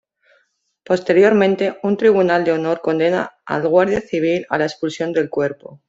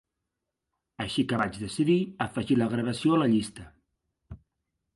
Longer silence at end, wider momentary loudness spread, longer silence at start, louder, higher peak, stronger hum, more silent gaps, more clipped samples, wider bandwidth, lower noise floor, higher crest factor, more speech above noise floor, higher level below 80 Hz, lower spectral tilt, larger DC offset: second, 0.15 s vs 0.6 s; about the same, 9 LU vs 9 LU; about the same, 0.9 s vs 1 s; first, -17 LUFS vs -27 LUFS; first, -2 dBFS vs -12 dBFS; neither; neither; neither; second, 7.8 kHz vs 11.5 kHz; second, -64 dBFS vs -85 dBFS; about the same, 16 dB vs 18 dB; second, 47 dB vs 58 dB; about the same, -56 dBFS vs -58 dBFS; about the same, -6.5 dB/octave vs -6 dB/octave; neither